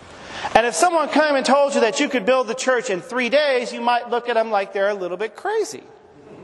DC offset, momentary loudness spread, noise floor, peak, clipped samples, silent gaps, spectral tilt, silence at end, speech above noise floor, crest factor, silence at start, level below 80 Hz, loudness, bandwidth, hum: under 0.1%; 9 LU; -44 dBFS; 0 dBFS; under 0.1%; none; -2.5 dB/octave; 0 s; 24 dB; 20 dB; 0 s; -56 dBFS; -19 LUFS; 12 kHz; none